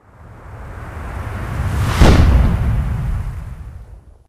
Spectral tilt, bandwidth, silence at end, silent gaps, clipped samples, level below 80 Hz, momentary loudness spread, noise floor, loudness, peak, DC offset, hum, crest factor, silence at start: -6.5 dB/octave; 15 kHz; 0.3 s; none; under 0.1%; -20 dBFS; 23 LU; -39 dBFS; -17 LUFS; 0 dBFS; under 0.1%; none; 16 dB; 0.2 s